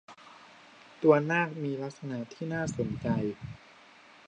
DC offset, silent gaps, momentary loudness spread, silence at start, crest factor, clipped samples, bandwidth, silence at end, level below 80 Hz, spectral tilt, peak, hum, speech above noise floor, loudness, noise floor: under 0.1%; none; 25 LU; 0.1 s; 22 dB; under 0.1%; 9.4 kHz; 0.7 s; -60 dBFS; -7 dB/octave; -10 dBFS; none; 26 dB; -30 LUFS; -56 dBFS